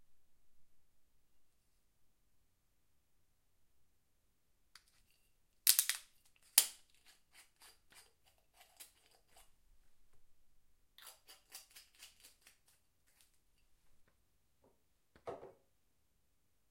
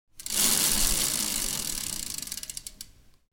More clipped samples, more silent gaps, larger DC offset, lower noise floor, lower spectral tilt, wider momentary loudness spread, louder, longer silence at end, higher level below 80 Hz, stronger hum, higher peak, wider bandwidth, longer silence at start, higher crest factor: neither; neither; neither; first, -82 dBFS vs -49 dBFS; second, 2.5 dB/octave vs 0 dB/octave; first, 28 LU vs 18 LU; second, -33 LUFS vs -25 LUFS; first, 1.25 s vs 0.4 s; second, -80 dBFS vs -40 dBFS; neither; about the same, -6 dBFS vs -6 dBFS; about the same, 16.5 kHz vs 17 kHz; about the same, 0.1 s vs 0.15 s; first, 42 dB vs 24 dB